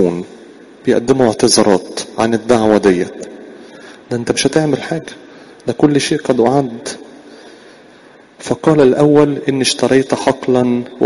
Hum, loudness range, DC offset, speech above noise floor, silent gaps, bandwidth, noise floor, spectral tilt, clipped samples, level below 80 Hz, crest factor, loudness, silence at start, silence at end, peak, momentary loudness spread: none; 4 LU; under 0.1%; 30 dB; none; 11.5 kHz; -42 dBFS; -5 dB/octave; under 0.1%; -50 dBFS; 14 dB; -14 LUFS; 0 s; 0 s; 0 dBFS; 15 LU